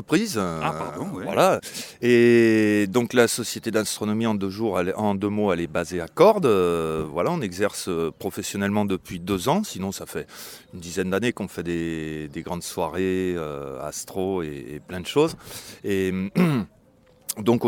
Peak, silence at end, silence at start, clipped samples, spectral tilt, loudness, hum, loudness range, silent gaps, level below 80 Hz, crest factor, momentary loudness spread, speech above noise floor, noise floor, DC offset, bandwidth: -4 dBFS; 0 s; 0 s; under 0.1%; -5 dB/octave; -24 LUFS; none; 8 LU; none; -54 dBFS; 20 dB; 15 LU; 33 dB; -56 dBFS; under 0.1%; 18 kHz